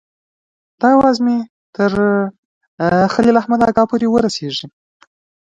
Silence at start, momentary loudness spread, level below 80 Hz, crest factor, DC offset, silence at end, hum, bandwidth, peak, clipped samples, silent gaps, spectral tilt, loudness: 0.8 s; 10 LU; -48 dBFS; 16 dB; under 0.1%; 0.8 s; none; 9 kHz; 0 dBFS; under 0.1%; 1.50-1.73 s, 2.38-2.61 s, 2.67-2.78 s; -6 dB/octave; -15 LUFS